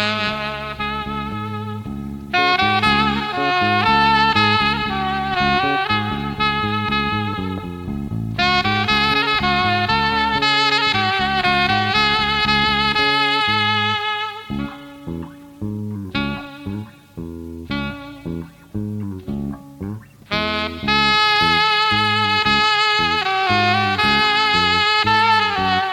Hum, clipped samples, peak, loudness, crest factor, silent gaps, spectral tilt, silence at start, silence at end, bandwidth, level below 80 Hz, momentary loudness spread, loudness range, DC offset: none; under 0.1%; -2 dBFS; -17 LUFS; 16 dB; none; -4.5 dB/octave; 0 s; 0 s; 17 kHz; -40 dBFS; 16 LU; 13 LU; under 0.1%